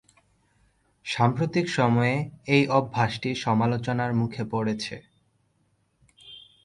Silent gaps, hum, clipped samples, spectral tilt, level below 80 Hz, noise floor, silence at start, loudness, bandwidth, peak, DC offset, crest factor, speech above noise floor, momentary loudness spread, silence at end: none; none; under 0.1%; -6.5 dB/octave; -60 dBFS; -69 dBFS; 1.05 s; -25 LUFS; 11 kHz; -6 dBFS; under 0.1%; 20 dB; 45 dB; 16 LU; 0.25 s